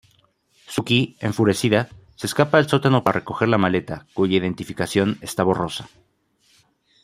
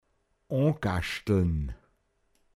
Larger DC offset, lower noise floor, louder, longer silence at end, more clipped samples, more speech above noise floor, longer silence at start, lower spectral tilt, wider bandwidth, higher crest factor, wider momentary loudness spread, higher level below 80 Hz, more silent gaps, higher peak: neither; second, -61 dBFS vs -71 dBFS; first, -21 LUFS vs -29 LUFS; first, 1.15 s vs 0.8 s; neither; about the same, 41 dB vs 44 dB; first, 0.7 s vs 0.5 s; second, -5.5 dB/octave vs -7 dB/octave; first, 16 kHz vs 14 kHz; about the same, 20 dB vs 18 dB; about the same, 11 LU vs 10 LU; second, -56 dBFS vs -42 dBFS; neither; first, -2 dBFS vs -12 dBFS